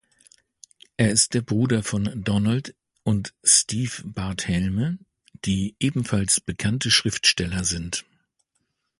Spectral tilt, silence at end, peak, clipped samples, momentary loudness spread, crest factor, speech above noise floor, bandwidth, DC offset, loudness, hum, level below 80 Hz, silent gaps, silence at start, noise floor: -3.5 dB/octave; 1 s; -2 dBFS; under 0.1%; 13 LU; 22 dB; 52 dB; 11.5 kHz; under 0.1%; -22 LUFS; none; -46 dBFS; none; 1 s; -75 dBFS